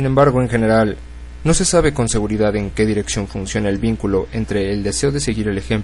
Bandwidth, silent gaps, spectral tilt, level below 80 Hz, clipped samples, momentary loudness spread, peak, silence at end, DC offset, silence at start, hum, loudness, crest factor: 11.5 kHz; none; -5 dB/octave; -30 dBFS; under 0.1%; 8 LU; -2 dBFS; 0 s; under 0.1%; 0 s; none; -18 LUFS; 16 dB